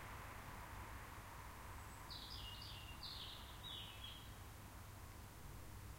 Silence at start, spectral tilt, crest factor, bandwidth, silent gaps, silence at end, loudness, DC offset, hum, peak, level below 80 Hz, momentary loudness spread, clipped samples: 0 s; -3.5 dB/octave; 16 dB; 16 kHz; none; 0 s; -53 LUFS; under 0.1%; none; -38 dBFS; -60 dBFS; 6 LU; under 0.1%